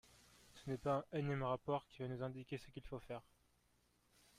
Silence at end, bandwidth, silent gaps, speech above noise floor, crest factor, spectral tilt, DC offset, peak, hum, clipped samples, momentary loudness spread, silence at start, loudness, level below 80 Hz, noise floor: 1.15 s; 14.5 kHz; none; 34 dB; 18 dB; -7.5 dB/octave; under 0.1%; -28 dBFS; 60 Hz at -75 dBFS; under 0.1%; 12 LU; 0.55 s; -45 LUFS; -68 dBFS; -78 dBFS